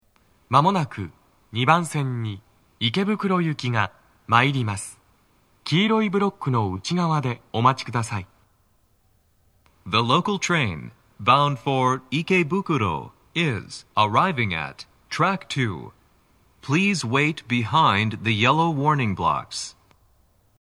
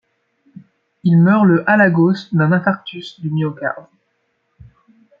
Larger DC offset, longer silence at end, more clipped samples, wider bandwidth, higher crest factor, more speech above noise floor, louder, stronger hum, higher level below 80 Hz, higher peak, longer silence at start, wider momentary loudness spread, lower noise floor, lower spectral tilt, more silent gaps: neither; second, 0.9 s vs 1.4 s; neither; first, 12.5 kHz vs 5.2 kHz; first, 22 dB vs 16 dB; second, 41 dB vs 52 dB; second, -22 LUFS vs -15 LUFS; neither; about the same, -58 dBFS vs -60 dBFS; about the same, 0 dBFS vs -2 dBFS; second, 0.5 s vs 1.05 s; about the same, 13 LU vs 13 LU; second, -63 dBFS vs -67 dBFS; second, -5.5 dB/octave vs -9 dB/octave; neither